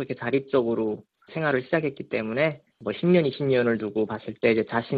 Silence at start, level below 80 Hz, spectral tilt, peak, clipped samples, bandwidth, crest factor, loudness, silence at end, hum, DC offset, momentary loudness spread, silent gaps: 0 s; -64 dBFS; -9.5 dB/octave; -8 dBFS; under 0.1%; 4.9 kHz; 18 dB; -25 LUFS; 0 s; none; under 0.1%; 9 LU; none